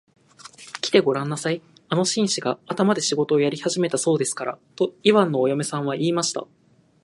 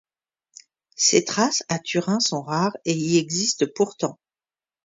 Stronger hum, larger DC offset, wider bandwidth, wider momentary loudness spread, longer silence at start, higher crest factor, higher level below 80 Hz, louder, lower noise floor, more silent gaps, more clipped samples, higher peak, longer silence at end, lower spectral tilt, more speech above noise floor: neither; neither; first, 11.5 kHz vs 7.8 kHz; first, 11 LU vs 6 LU; second, 0.45 s vs 1 s; about the same, 22 dB vs 22 dB; about the same, -72 dBFS vs -68 dBFS; about the same, -22 LUFS vs -22 LUFS; second, -46 dBFS vs under -90 dBFS; neither; neither; about the same, -2 dBFS vs -2 dBFS; second, 0.6 s vs 0.75 s; about the same, -4.5 dB/octave vs -3.5 dB/octave; second, 24 dB vs over 68 dB